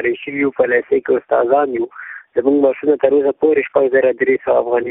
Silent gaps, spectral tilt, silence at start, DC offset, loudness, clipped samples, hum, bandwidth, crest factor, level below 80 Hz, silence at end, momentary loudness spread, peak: none; -10.5 dB/octave; 0 s; under 0.1%; -16 LUFS; under 0.1%; none; 3.9 kHz; 16 dB; -58 dBFS; 0 s; 6 LU; 0 dBFS